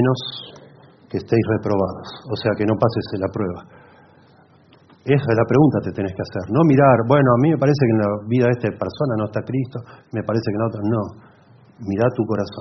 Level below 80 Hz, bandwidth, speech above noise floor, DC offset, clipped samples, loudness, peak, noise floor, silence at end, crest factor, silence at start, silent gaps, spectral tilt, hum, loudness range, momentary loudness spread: -54 dBFS; 6.2 kHz; 32 dB; under 0.1%; under 0.1%; -19 LUFS; -2 dBFS; -51 dBFS; 0 s; 18 dB; 0 s; none; -7 dB/octave; none; 7 LU; 15 LU